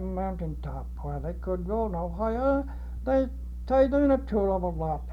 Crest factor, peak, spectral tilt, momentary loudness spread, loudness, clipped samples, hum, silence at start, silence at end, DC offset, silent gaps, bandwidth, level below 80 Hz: 16 dB; -12 dBFS; -9.5 dB/octave; 13 LU; -28 LUFS; under 0.1%; 60 Hz at -35 dBFS; 0 s; 0 s; under 0.1%; none; 6.2 kHz; -36 dBFS